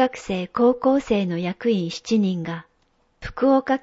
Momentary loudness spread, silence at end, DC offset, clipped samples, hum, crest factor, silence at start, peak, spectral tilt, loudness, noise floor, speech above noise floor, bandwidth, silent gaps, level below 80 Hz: 13 LU; 0.05 s; under 0.1%; under 0.1%; none; 16 dB; 0 s; -6 dBFS; -6.5 dB/octave; -22 LUFS; -65 dBFS; 43 dB; 8 kHz; none; -50 dBFS